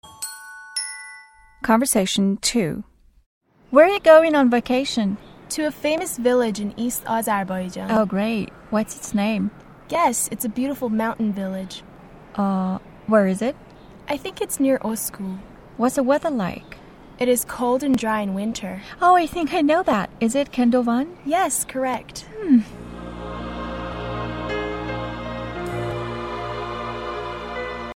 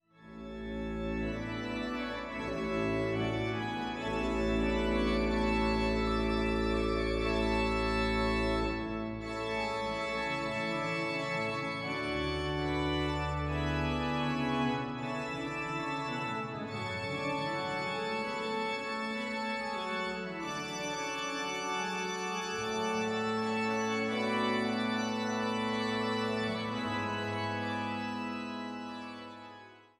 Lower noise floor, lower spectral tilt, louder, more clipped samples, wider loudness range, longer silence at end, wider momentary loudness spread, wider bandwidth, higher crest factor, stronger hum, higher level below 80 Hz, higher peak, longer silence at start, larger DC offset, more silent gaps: second, -47 dBFS vs -53 dBFS; about the same, -4.5 dB/octave vs -5 dB/octave; first, -22 LUFS vs -33 LUFS; neither; first, 7 LU vs 4 LU; second, 0 s vs 0.2 s; first, 14 LU vs 7 LU; first, 17.5 kHz vs 12.5 kHz; first, 22 dB vs 16 dB; neither; about the same, -46 dBFS vs -46 dBFS; first, 0 dBFS vs -18 dBFS; second, 0.05 s vs 0.2 s; neither; first, 3.26-3.41 s vs none